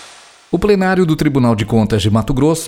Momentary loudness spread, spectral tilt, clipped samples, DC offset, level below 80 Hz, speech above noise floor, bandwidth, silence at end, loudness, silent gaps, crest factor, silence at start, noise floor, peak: 2 LU; -6.5 dB/octave; under 0.1%; under 0.1%; -32 dBFS; 27 dB; 16.5 kHz; 0 s; -14 LUFS; none; 14 dB; 0 s; -40 dBFS; 0 dBFS